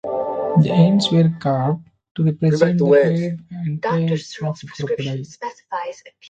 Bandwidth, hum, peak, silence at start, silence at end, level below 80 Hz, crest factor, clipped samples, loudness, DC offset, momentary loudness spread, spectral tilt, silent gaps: 8.8 kHz; none; -2 dBFS; 0.05 s; 0.2 s; -58 dBFS; 16 dB; under 0.1%; -19 LUFS; under 0.1%; 14 LU; -7.5 dB/octave; 2.11-2.15 s